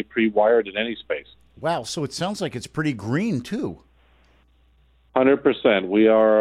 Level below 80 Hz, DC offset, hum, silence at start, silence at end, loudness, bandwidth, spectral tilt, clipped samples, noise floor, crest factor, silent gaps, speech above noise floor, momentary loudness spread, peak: -58 dBFS; under 0.1%; none; 0 s; 0 s; -22 LUFS; 13.5 kHz; -5.5 dB/octave; under 0.1%; -58 dBFS; 18 dB; none; 37 dB; 12 LU; -4 dBFS